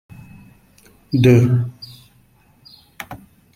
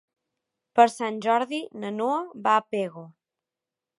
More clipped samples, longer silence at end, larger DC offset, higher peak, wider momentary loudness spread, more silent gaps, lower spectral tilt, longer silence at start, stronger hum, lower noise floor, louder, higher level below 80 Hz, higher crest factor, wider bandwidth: neither; second, 0.4 s vs 0.9 s; neither; about the same, -2 dBFS vs -4 dBFS; first, 26 LU vs 12 LU; neither; first, -8 dB/octave vs -4.5 dB/octave; first, 1.1 s vs 0.75 s; neither; second, -54 dBFS vs -89 dBFS; first, -16 LUFS vs -25 LUFS; first, -50 dBFS vs -82 dBFS; second, 18 dB vs 24 dB; first, 15 kHz vs 11.5 kHz